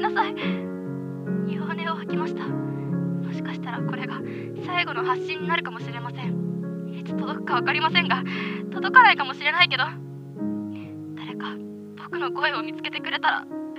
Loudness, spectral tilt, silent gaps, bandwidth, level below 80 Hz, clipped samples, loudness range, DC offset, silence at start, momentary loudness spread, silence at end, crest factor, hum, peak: -25 LUFS; -6.5 dB/octave; none; 8.6 kHz; -76 dBFS; under 0.1%; 8 LU; under 0.1%; 0 s; 14 LU; 0 s; 24 dB; none; -2 dBFS